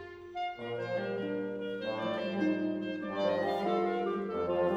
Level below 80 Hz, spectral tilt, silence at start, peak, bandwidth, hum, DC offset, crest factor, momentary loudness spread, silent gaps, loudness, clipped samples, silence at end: -68 dBFS; -7 dB/octave; 0 s; -18 dBFS; 8.2 kHz; none; under 0.1%; 16 dB; 7 LU; none; -34 LUFS; under 0.1%; 0 s